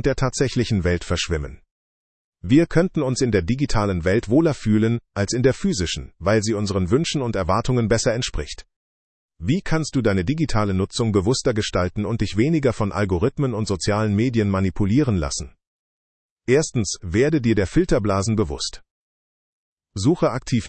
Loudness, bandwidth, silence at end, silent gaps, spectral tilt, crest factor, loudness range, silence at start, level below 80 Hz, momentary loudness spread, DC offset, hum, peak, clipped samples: -21 LUFS; 8.8 kHz; 0 s; 1.71-2.32 s, 8.76-9.29 s, 15.67-16.37 s, 18.91-19.77 s; -5.5 dB/octave; 18 dB; 2 LU; 0.05 s; -38 dBFS; 6 LU; under 0.1%; none; -4 dBFS; under 0.1%